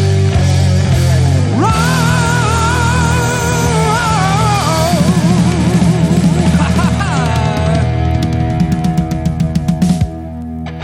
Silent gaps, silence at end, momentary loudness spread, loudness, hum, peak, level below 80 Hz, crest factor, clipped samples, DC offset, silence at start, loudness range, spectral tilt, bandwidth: none; 0 s; 4 LU; -12 LUFS; none; 0 dBFS; -24 dBFS; 12 dB; under 0.1%; under 0.1%; 0 s; 3 LU; -6 dB/octave; 16 kHz